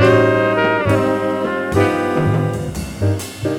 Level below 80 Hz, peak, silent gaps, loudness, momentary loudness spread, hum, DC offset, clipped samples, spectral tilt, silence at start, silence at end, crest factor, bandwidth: -38 dBFS; -2 dBFS; none; -17 LUFS; 7 LU; none; under 0.1%; under 0.1%; -6.5 dB/octave; 0 s; 0 s; 14 dB; 16.5 kHz